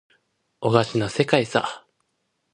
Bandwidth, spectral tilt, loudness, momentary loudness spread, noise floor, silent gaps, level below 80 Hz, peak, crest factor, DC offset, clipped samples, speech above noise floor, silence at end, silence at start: 11 kHz; -5.5 dB/octave; -22 LUFS; 10 LU; -74 dBFS; none; -58 dBFS; 0 dBFS; 24 dB; under 0.1%; under 0.1%; 53 dB; 0.75 s; 0.6 s